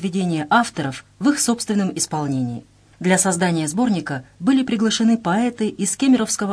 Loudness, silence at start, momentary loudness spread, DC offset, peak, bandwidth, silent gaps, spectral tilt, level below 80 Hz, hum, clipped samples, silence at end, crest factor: -20 LUFS; 0 s; 8 LU; under 0.1%; -4 dBFS; 11 kHz; none; -4.5 dB/octave; -58 dBFS; none; under 0.1%; 0 s; 16 dB